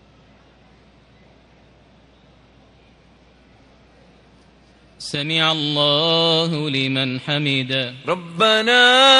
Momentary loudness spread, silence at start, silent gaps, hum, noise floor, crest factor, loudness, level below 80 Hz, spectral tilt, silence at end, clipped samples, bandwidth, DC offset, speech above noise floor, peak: 13 LU; 5 s; none; none; -51 dBFS; 20 dB; -17 LUFS; -60 dBFS; -4 dB/octave; 0 s; under 0.1%; 11.5 kHz; under 0.1%; 34 dB; 0 dBFS